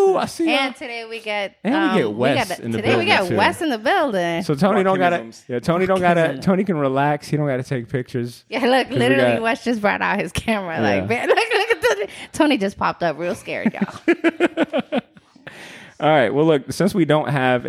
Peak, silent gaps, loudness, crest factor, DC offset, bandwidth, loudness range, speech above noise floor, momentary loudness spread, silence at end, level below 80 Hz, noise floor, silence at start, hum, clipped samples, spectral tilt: -2 dBFS; none; -19 LUFS; 18 dB; under 0.1%; 15.5 kHz; 2 LU; 25 dB; 9 LU; 0 s; -52 dBFS; -44 dBFS; 0 s; none; under 0.1%; -5.5 dB/octave